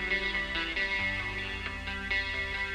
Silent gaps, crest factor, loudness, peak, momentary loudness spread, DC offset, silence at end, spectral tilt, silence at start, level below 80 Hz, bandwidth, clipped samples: none; 16 dB; -31 LUFS; -18 dBFS; 6 LU; under 0.1%; 0 s; -3.5 dB/octave; 0 s; -44 dBFS; 13 kHz; under 0.1%